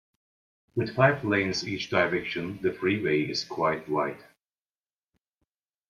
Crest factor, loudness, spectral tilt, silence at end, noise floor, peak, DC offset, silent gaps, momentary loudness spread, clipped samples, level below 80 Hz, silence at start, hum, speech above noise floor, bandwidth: 22 dB; -27 LUFS; -5.5 dB/octave; 1.7 s; under -90 dBFS; -8 dBFS; under 0.1%; none; 9 LU; under 0.1%; -64 dBFS; 0.75 s; none; over 63 dB; 12 kHz